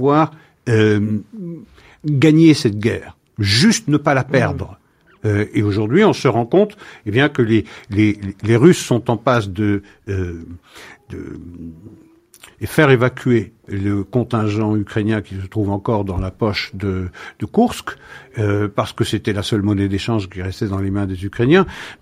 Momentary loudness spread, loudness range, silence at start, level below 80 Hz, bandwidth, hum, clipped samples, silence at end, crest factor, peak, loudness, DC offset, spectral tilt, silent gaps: 18 LU; 5 LU; 0 s; -44 dBFS; 15.5 kHz; none; under 0.1%; 0.05 s; 18 dB; 0 dBFS; -17 LUFS; under 0.1%; -6 dB/octave; none